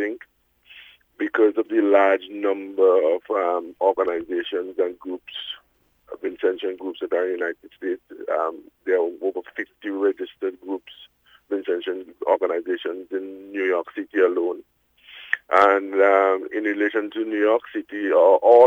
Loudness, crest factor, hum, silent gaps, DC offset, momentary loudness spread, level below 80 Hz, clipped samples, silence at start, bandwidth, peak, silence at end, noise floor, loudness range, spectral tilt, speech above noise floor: -22 LUFS; 20 dB; none; none; under 0.1%; 15 LU; -70 dBFS; under 0.1%; 0 s; 6.6 kHz; -4 dBFS; 0 s; -62 dBFS; 7 LU; -5 dB/octave; 41 dB